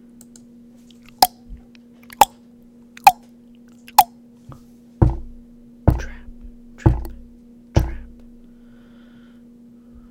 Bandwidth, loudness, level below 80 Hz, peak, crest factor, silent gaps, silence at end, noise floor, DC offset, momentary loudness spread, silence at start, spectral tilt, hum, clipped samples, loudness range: 16.5 kHz; -19 LUFS; -32 dBFS; 0 dBFS; 24 dB; none; 2.05 s; -47 dBFS; under 0.1%; 21 LU; 1.2 s; -4.5 dB/octave; none; under 0.1%; 7 LU